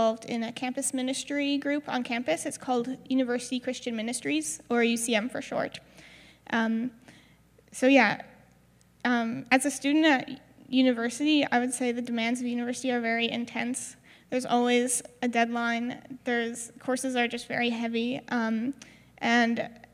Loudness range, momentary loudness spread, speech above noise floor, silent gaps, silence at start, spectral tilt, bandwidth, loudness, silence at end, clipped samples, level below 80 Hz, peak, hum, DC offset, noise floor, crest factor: 4 LU; 9 LU; 33 dB; none; 0 s; -3 dB/octave; 15 kHz; -28 LUFS; 0.15 s; under 0.1%; -70 dBFS; -6 dBFS; none; under 0.1%; -61 dBFS; 22 dB